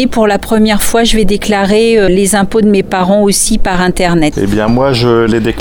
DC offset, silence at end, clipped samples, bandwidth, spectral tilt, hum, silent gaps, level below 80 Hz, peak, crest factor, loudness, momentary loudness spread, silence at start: under 0.1%; 0 s; under 0.1%; 19.5 kHz; -4.5 dB/octave; none; none; -22 dBFS; 0 dBFS; 8 dB; -10 LUFS; 3 LU; 0 s